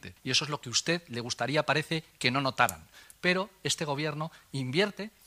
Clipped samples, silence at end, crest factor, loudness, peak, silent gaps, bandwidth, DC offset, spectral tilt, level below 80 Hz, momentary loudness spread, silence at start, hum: under 0.1%; 0.15 s; 22 dB; -30 LUFS; -8 dBFS; none; 15.5 kHz; under 0.1%; -3.5 dB/octave; -66 dBFS; 8 LU; 0.05 s; none